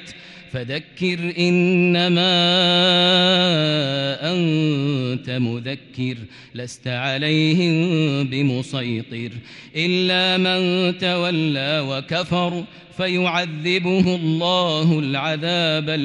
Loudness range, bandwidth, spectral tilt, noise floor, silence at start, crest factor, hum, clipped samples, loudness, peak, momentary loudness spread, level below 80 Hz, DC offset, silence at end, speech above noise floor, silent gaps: 6 LU; 10 kHz; -6 dB/octave; -40 dBFS; 0 s; 14 dB; none; under 0.1%; -19 LUFS; -6 dBFS; 15 LU; -58 dBFS; under 0.1%; 0 s; 21 dB; none